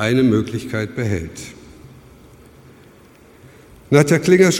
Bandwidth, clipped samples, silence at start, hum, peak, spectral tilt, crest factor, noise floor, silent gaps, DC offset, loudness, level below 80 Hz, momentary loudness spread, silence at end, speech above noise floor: 16.5 kHz; under 0.1%; 0 s; none; 0 dBFS; -6 dB/octave; 18 dB; -47 dBFS; none; under 0.1%; -17 LUFS; -48 dBFS; 18 LU; 0 s; 31 dB